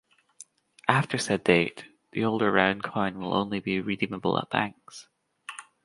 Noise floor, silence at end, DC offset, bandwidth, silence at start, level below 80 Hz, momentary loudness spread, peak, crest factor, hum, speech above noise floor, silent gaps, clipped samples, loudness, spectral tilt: -54 dBFS; 0.25 s; under 0.1%; 11.5 kHz; 0.4 s; -62 dBFS; 20 LU; -2 dBFS; 26 dB; none; 27 dB; none; under 0.1%; -27 LUFS; -5 dB/octave